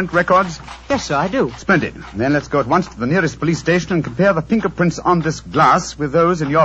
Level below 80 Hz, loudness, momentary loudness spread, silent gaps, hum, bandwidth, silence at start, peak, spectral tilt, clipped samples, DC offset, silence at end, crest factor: -42 dBFS; -17 LUFS; 7 LU; none; none; 8.2 kHz; 0 s; -2 dBFS; -6 dB/octave; under 0.1%; under 0.1%; 0 s; 16 dB